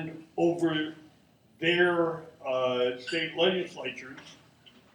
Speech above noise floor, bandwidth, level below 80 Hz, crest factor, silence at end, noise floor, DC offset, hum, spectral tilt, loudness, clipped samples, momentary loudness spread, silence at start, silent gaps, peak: 32 dB; 10 kHz; -72 dBFS; 18 dB; 0.25 s; -61 dBFS; under 0.1%; none; -5.5 dB/octave; -29 LUFS; under 0.1%; 14 LU; 0 s; none; -12 dBFS